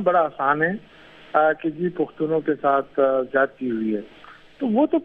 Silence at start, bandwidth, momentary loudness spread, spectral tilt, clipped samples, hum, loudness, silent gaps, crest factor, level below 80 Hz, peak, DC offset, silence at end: 0 s; 4.7 kHz; 7 LU; -9 dB/octave; under 0.1%; none; -22 LUFS; none; 18 dB; -62 dBFS; -4 dBFS; under 0.1%; 0 s